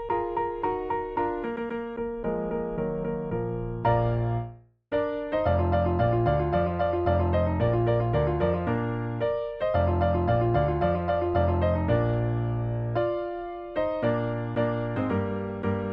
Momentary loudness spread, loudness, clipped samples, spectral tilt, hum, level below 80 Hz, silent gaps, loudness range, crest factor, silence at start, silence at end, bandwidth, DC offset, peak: 7 LU; -27 LUFS; under 0.1%; -10.5 dB/octave; none; -40 dBFS; none; 4 LU; 16 dB; 0 s; 0 s; 5.2 kHz; under 0.1%; -10 dBFS